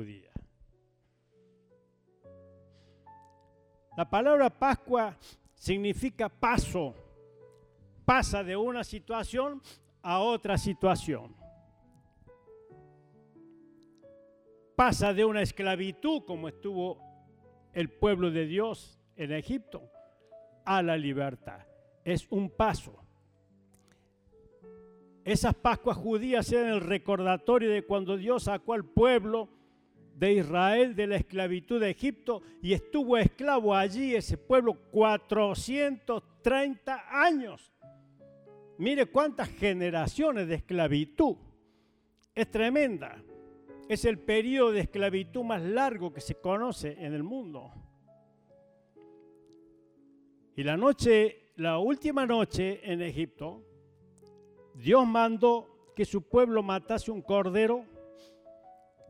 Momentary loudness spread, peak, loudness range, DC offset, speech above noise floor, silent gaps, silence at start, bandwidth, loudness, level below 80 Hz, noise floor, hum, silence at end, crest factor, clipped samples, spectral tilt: 13 LU; -8 dBFS; 7 LU; under 0.1%; 42 dB; none; 0 s; 15.5 kHz; -29 LUFS; -50 dBFS; -71 dBFS; none; 0.4 s; 22 dB; under 0.1%; -6 dB/octave